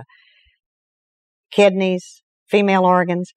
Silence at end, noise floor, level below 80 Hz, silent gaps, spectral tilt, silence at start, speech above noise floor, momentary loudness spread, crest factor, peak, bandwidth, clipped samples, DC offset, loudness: 0.1 s; under -90 dBFS; -74 dBFS; 0.66-1.44 s, 2.23-2.46 s; -6 dB/octave; 0 s; over 73 dB; 8 LU; 18 dB; -2 dBFS; 10.5 kHz; under 0.1%; under 0.1%; -17 LUFS